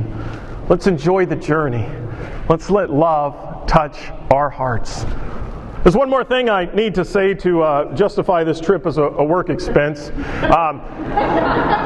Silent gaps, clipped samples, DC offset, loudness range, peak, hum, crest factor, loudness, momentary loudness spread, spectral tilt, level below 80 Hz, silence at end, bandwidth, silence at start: none; under 0.1%; under 0.1%; 2 LU; 0 dBFS; none; 16 dB; -17 LUFS; 12 LU; -7 dB/octave; -30 dBFS; 0 s; 10.5 kHz; 0 s